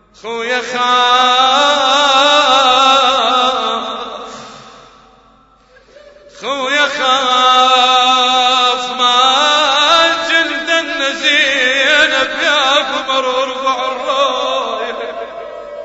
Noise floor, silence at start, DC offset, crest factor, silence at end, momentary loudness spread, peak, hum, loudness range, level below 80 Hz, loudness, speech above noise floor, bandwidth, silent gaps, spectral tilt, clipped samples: -48 dBFS; 0.25 s; under 0.1%; 14 dB; 0 s; 13 LU; 0 dBFS; none; 8 LU; -54 dBFS; -11 LUFS; 35 dB; 9 kHz; none; 0 dB/octave; under 0.1%